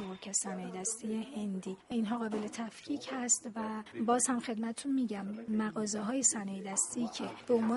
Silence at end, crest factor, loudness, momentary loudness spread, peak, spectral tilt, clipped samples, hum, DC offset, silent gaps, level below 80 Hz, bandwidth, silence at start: 0 s; 20 dB; -34 LUFS; 10 LU; -16 dBFS; -3.5 dB/octave; under 0.1%; none; under 0.1%; none; -76 dBFS; 11.5 kHz; 0 s